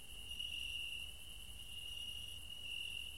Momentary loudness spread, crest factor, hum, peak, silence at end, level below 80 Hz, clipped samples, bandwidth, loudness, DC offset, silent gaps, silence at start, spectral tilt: 8 LU; 14 dB; none; -34 dBFS; 0 s; -60 dBFS; under 0.1%; 16 kHz; -45 LUFS; 0.2%; none; 0 s; -0.5 dB/octave